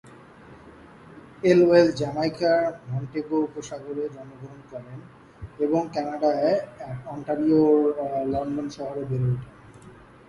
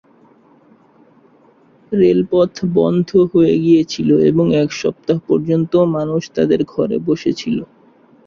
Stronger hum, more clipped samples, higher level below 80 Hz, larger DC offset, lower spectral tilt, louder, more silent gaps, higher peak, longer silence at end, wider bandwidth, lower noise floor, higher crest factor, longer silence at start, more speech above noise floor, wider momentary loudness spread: neither; neither; about the same, -56 dBFS vs -52 dBFS; neither; about the same, -7.5 dB/octave vs -7.5 dB/octave; second, -24 LUFS vs -15 LUFS; neither; about the same, -4 dBFS vs -2 dBFS; second, 0.35 s vs 0.6 s; first, 11.5 kHz vs 7.2 kHz; about the same, -48 dBFS vs -50 dBFS; first, 20 dB vs 14 dB; second, 0.05 s vs 1.9 s; second, 24 dB vs 36 dB; first, 22 LU vs 7 LU